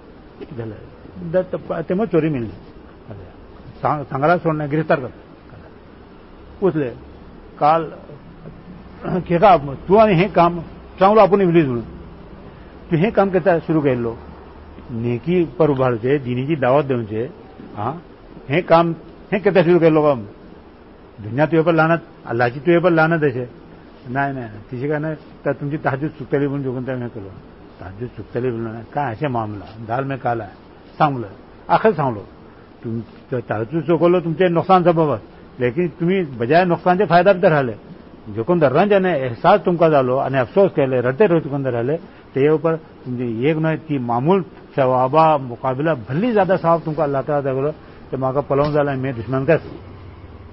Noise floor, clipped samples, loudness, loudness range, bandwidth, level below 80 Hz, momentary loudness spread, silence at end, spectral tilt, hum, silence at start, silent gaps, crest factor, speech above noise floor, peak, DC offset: -43 dBFS; under 0.1%; -18 LUFS; 8 LU; 5.8 kHz; -46 dBFS; 19 LU; 0.05 s; -12 dB/octave; none; 0.1 s; none; 16 dB; 25 dB; -2 dBFS; 0.1%